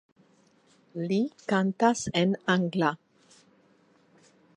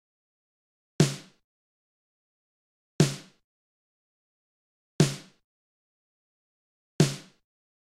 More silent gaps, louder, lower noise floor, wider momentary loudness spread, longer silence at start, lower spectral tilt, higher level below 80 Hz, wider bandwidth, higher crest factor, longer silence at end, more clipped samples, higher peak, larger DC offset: second, none vs 1.44-2.99 s, 3.44-4.99 s, 5.44-6.99 s; about the same, -27 LUFS vs -27 LUFS; second, -63 dBFS vs under -90 dBFS; second, 10 LU vs 16 LU; about the same, 0.95 s vs 1 s; about the same, -5.5 dB/octave vs -5.5 dB/octave; second, -68 dBFS vs -62 dBFS; second, 10.5 kHz vs 14.5 kHz; about the same, 22 dB vs 26 dB; first, 1.6 s vs 0.8 s; neither; about the same, -8 dBFS vs -6 dBFS; neither